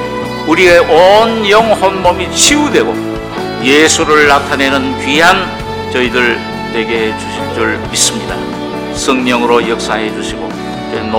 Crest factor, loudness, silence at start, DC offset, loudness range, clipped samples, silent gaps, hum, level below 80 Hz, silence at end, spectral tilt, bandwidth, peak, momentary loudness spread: 10 dB; -10 LUFS; 0 s; under 0.1%; 5 LU; 2%; none; none; -36 dBFS; 0 s; -3 dB/octave; over 20 kHz; 0 dBFS; 13 LU